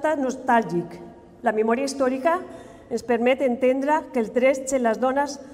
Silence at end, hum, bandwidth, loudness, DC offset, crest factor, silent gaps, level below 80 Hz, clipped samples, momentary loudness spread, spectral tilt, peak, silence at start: 0 s; none; 15 kHz; -23 LUFS; under 0.1%; 14 dB; none; -60 dBFS; under 0.1%; 10 LU; -4.5 dB/octave; -8 dBFS; 0 s